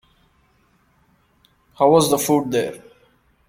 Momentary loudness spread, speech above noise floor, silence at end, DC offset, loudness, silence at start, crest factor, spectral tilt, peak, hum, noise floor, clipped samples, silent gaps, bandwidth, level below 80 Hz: 13 LU; 43 dB; 0.7 s; under 0.1%; -18 LUFS; 1.8 s; 20 dB; -4.5 dB/octave; -2 dBFS; none; -60 dBFS; under 0.1%; none; 16.5 kHz; -58 dBFS